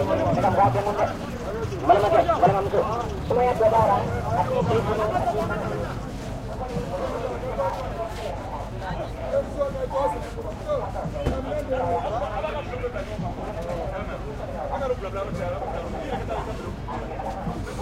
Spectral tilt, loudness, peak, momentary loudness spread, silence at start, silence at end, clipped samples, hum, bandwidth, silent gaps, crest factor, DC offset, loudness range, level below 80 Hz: -7 dB/octave; -26 LUFS; -6 dBFS; 12 LU; 0 s; 0 s; under 0.1%; none; 16 kHz; none; 20 dB; under 0.1%; 8 LU; -38 dBFS